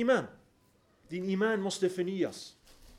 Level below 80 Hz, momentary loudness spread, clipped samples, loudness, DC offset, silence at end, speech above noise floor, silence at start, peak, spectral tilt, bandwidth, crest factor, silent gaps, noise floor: -66 dBFS; 17 LU; under 0.1%; -32 LUFS; under 0.1%; 0 s; 36 dB; 0 s; -16 dBFS; -5 dB/octave; 15 kHz; 16 dB; none; -67 dBFS